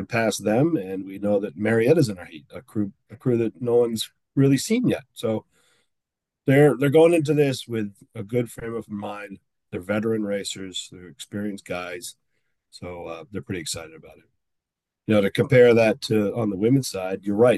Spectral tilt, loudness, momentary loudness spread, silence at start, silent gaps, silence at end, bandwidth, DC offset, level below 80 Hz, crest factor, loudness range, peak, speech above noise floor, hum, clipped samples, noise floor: -6 dB/octave; -22 LUFS; 19 LU; 0 s; none; 0 s; 12.5 kHz; under 0.1%; -64 dBFS; 18 dB; 12 LU; -4 dBFS; 62 dB; none; under 0.1%; -85 dBFS